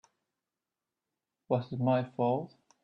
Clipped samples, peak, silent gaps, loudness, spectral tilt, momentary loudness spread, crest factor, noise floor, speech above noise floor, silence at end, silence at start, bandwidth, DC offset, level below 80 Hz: under 0.1%; -16 dBFS; none; -32 LUFS; -9.5 dB/octave; 6 LU; 20 dB; -90 dBFS; 60 dB; 0.35 s; 1.5 s; 6.4 kHz; under 0.1%; -76 dBFS